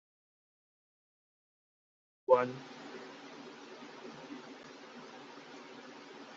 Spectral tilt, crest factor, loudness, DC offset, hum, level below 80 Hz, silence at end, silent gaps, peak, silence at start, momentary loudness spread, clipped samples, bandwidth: -3.5 dB/octave; 28 dB; -35 LUFS; under 0.1%; none; -90 dBFS; 0 s; none; -12 dBFS; 2.3 s; 21 LU; under 0.1%; 7.6 kHz